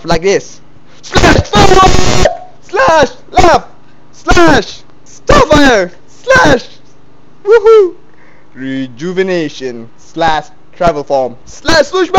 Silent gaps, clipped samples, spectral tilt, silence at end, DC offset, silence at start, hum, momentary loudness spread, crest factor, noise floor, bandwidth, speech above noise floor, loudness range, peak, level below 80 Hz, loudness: none; 0.5%; -4.5 dB/octave; 0 s; under 0.1%; 0.05 s; none; 15 LU; 10 dB; -43 dBFS; 16 kHz; 35 dB; 6 LU; 0 dBFS; -22 dBFS; -9 LUFS